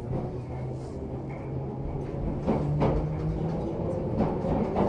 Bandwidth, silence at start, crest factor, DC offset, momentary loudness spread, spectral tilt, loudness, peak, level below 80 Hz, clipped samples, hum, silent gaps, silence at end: 8.6 kHz; 0 s; 16 dB; under 0.1%; 9 LU; -9.5 dB/octave; -31 LUFS; -12 dBFS; -40 dBFS; under 0.1%; none; none; 0 s